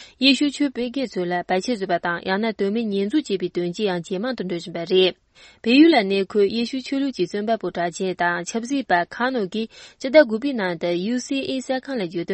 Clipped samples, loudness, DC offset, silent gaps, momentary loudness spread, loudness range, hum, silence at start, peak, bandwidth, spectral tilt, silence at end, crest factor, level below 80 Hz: under 0.1%; -22 LUFS; under 0.1%; none; 10 LU; 4 LU; none; 0 s; -2 dBFS; 8.8 kHz; -5 dB/octave; 0 s; 20 dB; -62 dBFS